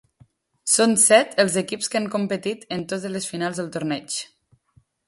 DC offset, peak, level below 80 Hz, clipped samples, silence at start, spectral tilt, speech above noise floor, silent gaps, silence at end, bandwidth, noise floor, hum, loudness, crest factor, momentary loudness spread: under 0.1%; -2 dBFS; -66 dBFS; under 0.1%; 0.65 s; -3 dB/octave; 39 dB; none; 0.8 s; 12 kHz; -61 dBFS; none; -21 LUFS; 20 dB; 15 LU